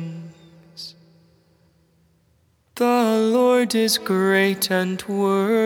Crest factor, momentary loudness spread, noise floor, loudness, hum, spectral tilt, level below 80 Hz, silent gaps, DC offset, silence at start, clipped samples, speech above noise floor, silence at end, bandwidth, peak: 18 dB; 20 LU; -62 dBFS; -19 LUFS; none; -4.5 dB/octave; -70 dBFS; none; under 0.1%; 0 s; under 0.1%; 42 dB; 0 s; over 20 kHz; -4 dBFS